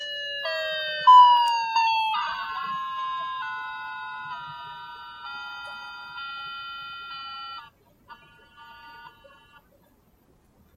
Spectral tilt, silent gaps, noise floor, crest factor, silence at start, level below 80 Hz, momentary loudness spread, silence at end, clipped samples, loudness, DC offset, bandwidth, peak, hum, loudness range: -1 dB/octave; none; -61 dBFS; 22 dB; 0 s; -68 dBFS; 22 LU; 1.65 s; under 0.1%; -23 LUFS; under 0.1%; 13 kHz; -4 dBFS; none; 20 LU